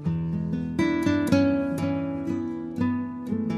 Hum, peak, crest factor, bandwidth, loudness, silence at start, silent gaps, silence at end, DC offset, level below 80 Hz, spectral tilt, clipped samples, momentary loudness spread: none; -8 dBFS; 18 dB; 13.5 kHz; -26 LUFS; 0 s; none; 0 s; under 0.1%; -50 dBFS; -7.5 dB/octave; under 0.1%; 8 LU